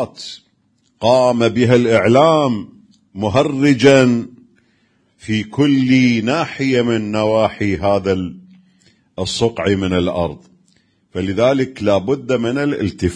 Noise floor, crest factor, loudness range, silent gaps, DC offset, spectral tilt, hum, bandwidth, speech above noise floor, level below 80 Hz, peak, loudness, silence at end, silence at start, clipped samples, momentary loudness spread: -61 dBFS; 16 dB; 6 LU; none; under 0.1%; -6 dB/octave; none; 10 kHz; 46 dB; -46 dBFS; 0 dBFS; -16 LUFS; 0 s; 0 s; under 0.1%; 13 LU